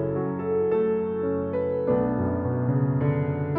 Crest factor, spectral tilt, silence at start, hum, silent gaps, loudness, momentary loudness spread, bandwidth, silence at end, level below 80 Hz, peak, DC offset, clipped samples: 12 dB; -13 dB/octave; 0 s; none; none; -25 LUFS; 3 LU; 3.8 kHz; 0 s; -52 dBFS; -12 dBFS; under 0.1%; under 0.1%